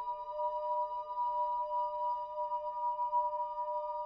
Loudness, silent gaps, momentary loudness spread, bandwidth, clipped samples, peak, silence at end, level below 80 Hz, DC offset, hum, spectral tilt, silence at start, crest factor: -36 LUFS; none; 4 LU; 5.2 kHz; under 0.1%; -24 dBFS; 0 s; -72 dBFS; under 0.1%; none; -1.5 dB/octave; 0 s; 12 dB